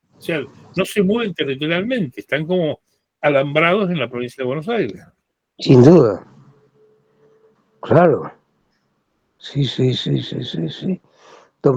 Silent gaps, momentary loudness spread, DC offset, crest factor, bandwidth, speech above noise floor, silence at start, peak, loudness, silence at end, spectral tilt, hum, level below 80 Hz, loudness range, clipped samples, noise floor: none; 13 LU; under 0.1%; 18 dB; 17 kHz; 51 dB; 0.25 s; 0 dBFS; -18 LUFS; 0 s; -7 dB/octave; none; -54 dBFS; 6 LU; under 0.1%; -67 dBFS